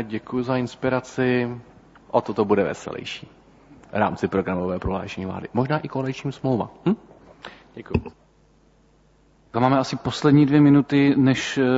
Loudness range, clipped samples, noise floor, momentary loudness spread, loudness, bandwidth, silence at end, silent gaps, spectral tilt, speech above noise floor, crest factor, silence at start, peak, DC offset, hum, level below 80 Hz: 9 LU; under 0.1%; -57 dBFS; 15 LU; -22 LUFS; 8 kHz; 0 s; none; -7 dB/octave; 36 dB; 18 dB; 0 s; -4 dBFS; under 0.1%; none; -48 dBFS